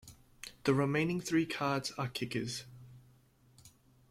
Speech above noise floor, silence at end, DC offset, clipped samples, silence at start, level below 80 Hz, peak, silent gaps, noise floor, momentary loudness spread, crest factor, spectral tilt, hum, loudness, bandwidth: 32 dB; 0.45 s; under 0.1%; under 0.1%; 0.05 s; -66 dBFS; -16 dBFS; none; -65 dBFS; 19 LU; 20 dB; -5.5 dB/octave; none; -34 LUFS; 16 kHz